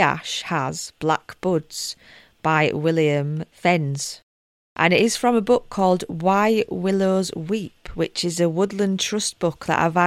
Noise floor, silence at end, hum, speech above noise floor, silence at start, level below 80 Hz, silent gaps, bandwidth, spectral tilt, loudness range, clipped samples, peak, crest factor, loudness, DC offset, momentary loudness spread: under -90 dBFS; 0 s; none; over 69 dB; 0 s; -52 dBFS; 4.23-4.76 s; 15.5 kHz; -4.5 dB/octave; 3 LU; under 0.1%; -2 dBFS; 18 dB; -22 LUFS; under 0.1%; 10 LU